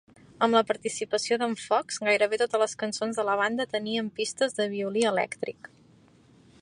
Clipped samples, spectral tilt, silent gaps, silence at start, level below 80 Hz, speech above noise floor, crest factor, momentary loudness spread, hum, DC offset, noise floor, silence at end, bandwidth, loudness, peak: under 0.1%; -3 dB/octave; none; 0.4 s; -72 dBFS; 31 dB; 20 dB; 7 LU; none; under 0.1%; -58 dBFS; 1.1 s; 11.5 kHz; -27 LUFS; -8 dBFS